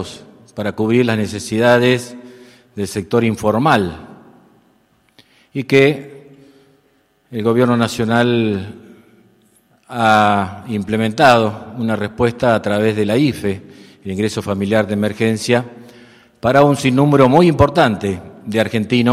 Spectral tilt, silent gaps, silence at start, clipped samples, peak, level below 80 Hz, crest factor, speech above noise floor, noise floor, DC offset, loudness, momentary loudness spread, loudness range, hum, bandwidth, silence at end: -6 dB/octave; none; 0 s; 0.2%; 0 dBFS; -46 dBFS; 16 dB; 43 dB; -58 dBFS; under 0.1%; -15 LUFS; 15 LU; 6 LU; none; 15 kHz; 0 s